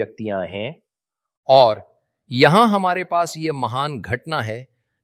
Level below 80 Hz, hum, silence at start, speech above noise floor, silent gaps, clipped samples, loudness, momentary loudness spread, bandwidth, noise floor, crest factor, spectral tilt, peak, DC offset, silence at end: -58 dBFS; none; 0 s; 67 dB; 1.37-1.43 s; under 0.1%; -18 LUFS; 16 LU; 15 kHz; -86 dBFS; 20 dB; -5.5 dB/octave; 0 dBFS; under 0.1%; 0.4 s